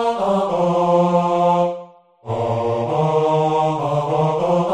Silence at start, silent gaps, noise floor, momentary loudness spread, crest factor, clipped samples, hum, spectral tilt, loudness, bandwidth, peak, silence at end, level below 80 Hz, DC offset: 0 s; none; -40 dBFS; 6 LU; 14 dB; under 0.1%; none; -7.5 dB/octave; -18 LUFS; 10 kHz; -4 dBFS; 0 s; -54 dBFS; under 0.1%